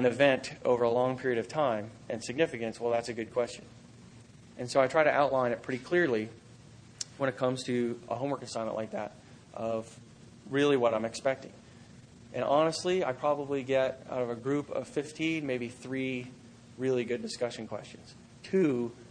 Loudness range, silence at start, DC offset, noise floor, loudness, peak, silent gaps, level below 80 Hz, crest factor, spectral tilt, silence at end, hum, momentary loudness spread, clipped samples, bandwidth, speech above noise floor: 5 LU; 0 s; under 0.1%; -53 dBFS; -31 LUFS; -10 dBFS; none; -68 dBFS; 22 dB; -5 dB/octave; 0 s; none; 14 LU; under 0.1%; 10 kHz; 23 dB